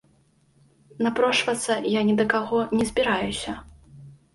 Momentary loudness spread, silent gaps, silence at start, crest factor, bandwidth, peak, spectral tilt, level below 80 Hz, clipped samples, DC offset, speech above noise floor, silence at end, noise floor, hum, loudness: 8 LU; none; 1 s; 20 dB; 11.5 kHz; -6 dBFS; -4 dB/octave; -52 dBFS; under 0.1%; under 0.1%; 39 dB; 0.2 s; -62 dBFS; none; -23 LUFS